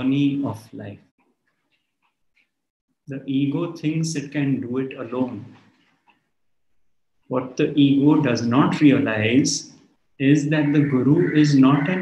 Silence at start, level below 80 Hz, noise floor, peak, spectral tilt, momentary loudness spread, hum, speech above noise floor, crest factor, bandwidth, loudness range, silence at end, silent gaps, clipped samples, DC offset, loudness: 0 s; -66 dBFS; -73 dBFS; -4 dBFS; -6 dB/octave; 13 LU; none; 54 dB; 18 dB; 10.5 kHz; 11 LU; 0 s; 1.11-1.18 s, 2.70-2.88 s; under 0.1%; under 0.1%; -20 LUFS